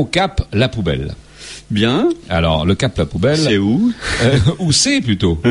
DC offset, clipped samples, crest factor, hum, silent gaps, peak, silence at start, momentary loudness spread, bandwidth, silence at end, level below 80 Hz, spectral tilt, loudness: under 0.1%; under 0.1%; 14 dB; none; none; -2 dBFS; 0 s; 9 LU; 11.5 kHz; 0 s; -32 dBFS; -5 dB/octave; -15 LUFS